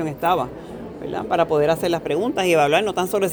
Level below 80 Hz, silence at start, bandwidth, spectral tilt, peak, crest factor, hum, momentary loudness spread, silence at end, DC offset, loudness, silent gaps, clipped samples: -50 dBFS; 0 s; over 20 kHz; -5 dB/octave; -4 dBFS; 16 dB; none; 13 LU; 0 s; under 0.1%; -20 LUFS; none; under 0.1%